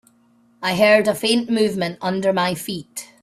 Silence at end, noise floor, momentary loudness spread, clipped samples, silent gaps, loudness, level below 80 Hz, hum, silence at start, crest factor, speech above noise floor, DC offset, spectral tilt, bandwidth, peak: 0.2 s; -57 dBFS; 13 LU; under 0.1%; none; -19 LUFS; -62 dBFS; none; 0.6 s; 18 dB; 38 dB; under 0.1%; -4.5 dB/octave; 15.5 kHz; -2 dBFS